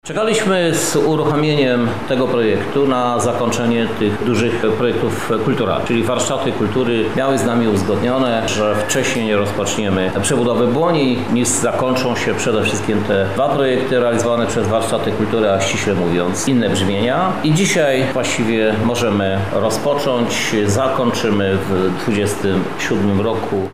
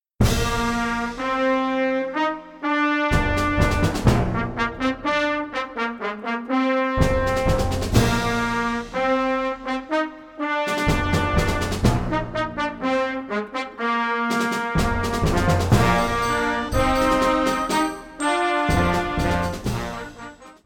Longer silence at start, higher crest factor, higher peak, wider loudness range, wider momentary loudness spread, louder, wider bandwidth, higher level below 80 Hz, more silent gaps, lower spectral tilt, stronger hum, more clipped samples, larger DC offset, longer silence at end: second, 0 s vs 0.2 s; second, 10 dB vs 20 dB; second, -6 dBFS vs -2 dBFS; about the same, 1 LU vs 3 LU; second, 3 LU vs 7 LU; first, -16 LUFS vs -22 LUFS; second, 16 kHz vs 19 kHz; second, -46 dBFS vs -32 dBFS; neither; about the same, -5 dB/octave vs -5.5 dB/octave; neither; neither; first, 2% vs under 0.1%; about the same, 0 s vs 0.1 s